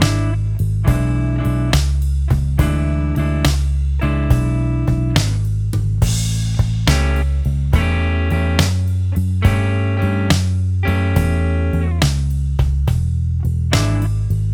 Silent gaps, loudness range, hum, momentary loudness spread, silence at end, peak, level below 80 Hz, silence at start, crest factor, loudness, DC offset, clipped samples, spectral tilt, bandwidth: none; 1 LU; none; 3 LU; 0 s; 0 dBFS; -20 dBFS; 0 s; 16 dB; -18 LUFS; under 0.1%; under 0.1%; -6 dB/octave; 17.5 kHz